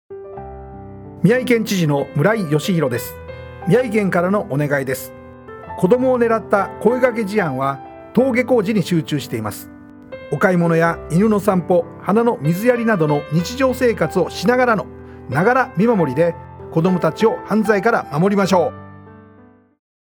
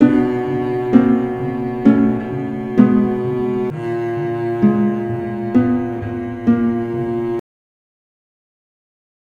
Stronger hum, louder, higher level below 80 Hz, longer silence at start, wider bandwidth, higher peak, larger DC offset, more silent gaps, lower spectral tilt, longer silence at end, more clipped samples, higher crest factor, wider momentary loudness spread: neither; about the same, -17 LUFS vs -18 LUFS; about the same, -48 dBFS vs -46 dBFS; about the same, 0.1 s vs 0 s; first, over 20 kHz vs 4.8 kHz; about the same, -2 dBFS vs 0 dBFS; neither; neither; second, -6.5 dB/octave vs -9.5 dB/octave; second, 0.9 s vs 1.85 s; neither; about the same, 16 dB vs 18 dB; first, 18 LU vs 9 LU